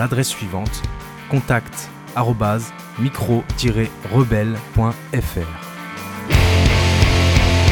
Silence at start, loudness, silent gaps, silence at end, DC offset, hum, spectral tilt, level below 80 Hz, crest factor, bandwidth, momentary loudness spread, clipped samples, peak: 0 s; -19 LUFS; none; 0 s; under 0.1%; none; -5.5 dB/octave; -26 dBFS; 16 dB; 19.5 kHz; 15 LU; under 0.1%; -2 dBFS